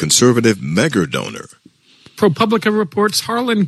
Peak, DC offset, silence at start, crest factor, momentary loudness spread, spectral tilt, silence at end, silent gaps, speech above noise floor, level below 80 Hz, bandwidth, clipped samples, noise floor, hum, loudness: 0 dBFS; under 0.1%; 0 s; 16 dB; 10 LU; -4 dB/octave; 0 s; none; 33 dB; -54 dBFS; 13 kHz; under 0.1%; -48 dBFS; none; -15 LUFS